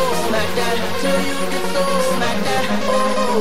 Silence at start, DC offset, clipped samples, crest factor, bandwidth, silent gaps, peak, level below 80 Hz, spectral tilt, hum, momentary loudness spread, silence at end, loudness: 0 s; 9%; under 0.1%; 14 dB; 16 kHz; none; -4 dBFS; -44 dBFS; -4 dB/octave; none; 2 LU; 0 s; -19 LUFS